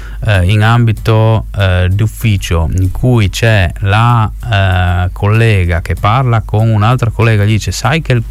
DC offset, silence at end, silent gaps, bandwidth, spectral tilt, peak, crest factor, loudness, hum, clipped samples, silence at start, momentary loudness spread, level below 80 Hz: under 0.1%; 0 s; none; 14.5 kHz; -6.5 dB/octave; 0 dBFS; 10 dB; -11 LUFS; none; under 0.1%; 0 s; 4 LU; -24 dBFS